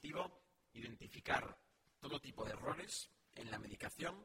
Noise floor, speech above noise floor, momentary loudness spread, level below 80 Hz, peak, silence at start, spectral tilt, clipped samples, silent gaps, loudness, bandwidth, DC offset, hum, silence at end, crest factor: -66 dBFS; 21 dB; 14 LU; -68 dBFS; -24 dBFS; 0 s; -3.5 dB/octave; under 0.1%; none; -47 LUFS; 16.5 kHz; under 0.1%; none; 0 s; 24 dB